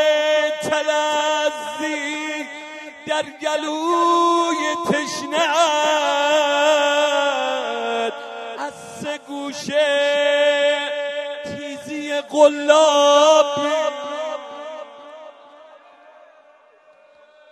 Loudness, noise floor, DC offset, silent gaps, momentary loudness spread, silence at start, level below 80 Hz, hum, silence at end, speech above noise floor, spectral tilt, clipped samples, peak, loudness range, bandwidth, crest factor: -19 LUFS; -52 dBFS; under 0.1%; none; 16 LU; 0 s; -74 dBFS; none; 1.9 s; 35 dB; -2 dB/octave; under 0.1%; 0 dBFS; 5 LU; 13 kHz; 18 dB